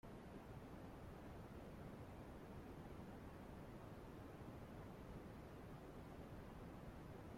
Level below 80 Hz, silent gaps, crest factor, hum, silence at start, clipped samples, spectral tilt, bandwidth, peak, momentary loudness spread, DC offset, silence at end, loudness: -64 dBFS; none; 14 dB; none; 0.05 s; under 0.1%; -7 dB/octave; 16.5 kHz; -42 dBFS; 1 LU; under 0.1%; 0 s; -57 LUFS